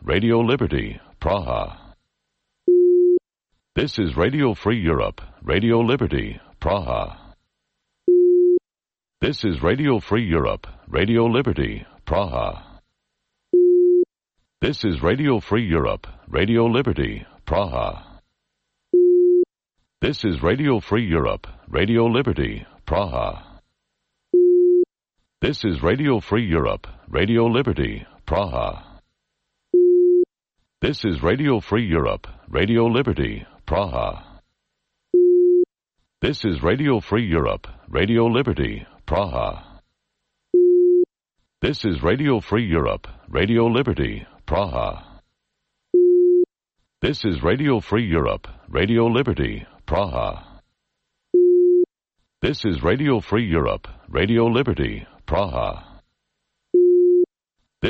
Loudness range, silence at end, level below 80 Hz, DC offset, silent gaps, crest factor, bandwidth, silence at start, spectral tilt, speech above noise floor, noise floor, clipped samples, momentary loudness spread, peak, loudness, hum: 3 LU; 0 s; -36 dBFS; under 0.1%; none; 14 dB; 6.4 kHz; 0 s; -8.5 dB/octave; over 69 dB; under -90 dBFS; under 0.1%; 12 LU; -8 dBFS; -20 LUFS; none